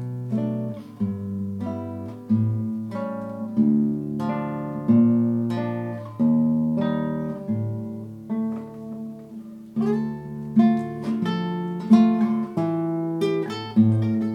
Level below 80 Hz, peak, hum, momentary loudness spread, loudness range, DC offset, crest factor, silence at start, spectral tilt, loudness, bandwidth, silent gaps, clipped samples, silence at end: -60 dBFS; -4 dBFS; none; 14 LU; 6 LU; under 0.1%; 20 dB; 0 s; -9 dB/octave; -24 LUFS; 6 kHz; none; under 0.1%; 0 s